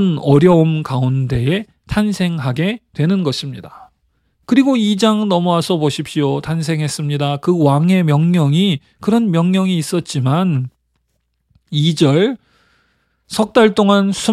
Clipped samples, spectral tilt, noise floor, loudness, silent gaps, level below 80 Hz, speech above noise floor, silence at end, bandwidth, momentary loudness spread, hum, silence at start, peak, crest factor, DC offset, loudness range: under 0.1%; -6.5 dB/octave; -67 dBFS; -15 LUFS; none; -46 dBFS; 53 dB; 0 s; 14 kHz; 8 LU; none; 0 s; 0 dBFS; 14 dB; under 0.1%; 4 LU